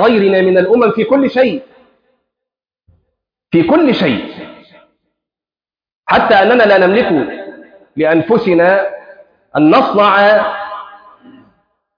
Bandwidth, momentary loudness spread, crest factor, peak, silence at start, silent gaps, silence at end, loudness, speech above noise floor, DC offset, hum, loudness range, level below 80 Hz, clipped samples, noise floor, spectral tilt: 5.2 kHz; 19 LU; 12 dB; 0 dBFS; 0 s; 5.95-6.03 s; 1 s; -11 LUFS; over 80 dB; under 0.1%; none; 6 LU; -52 dBFS; under 0.1%; under -90 dBFS; -8 dB/octave